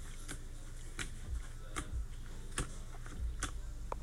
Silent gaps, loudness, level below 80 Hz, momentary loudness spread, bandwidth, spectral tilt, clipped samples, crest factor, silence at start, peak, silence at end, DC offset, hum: none; -45 LUFS; -44 dBFS; 8 LU; 15.5 kHz; -3.5 dB/octave; under 0.1%; 22 dB; 0 s; -20 dBFS; 0 s; under 0.1%; none